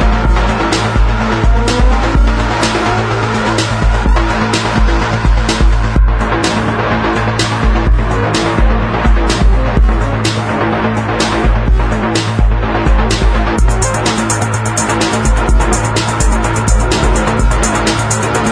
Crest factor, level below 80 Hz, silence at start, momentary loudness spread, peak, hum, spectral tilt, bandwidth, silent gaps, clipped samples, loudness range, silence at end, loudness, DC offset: 10 dB; -14 dBFS; 0 s; 2 LU; 0 dBFS; none; -5 dB/octave; 11 kHz; none; under 0.1%; 1 LU; 0 s; -13 LUFS; under 0.1%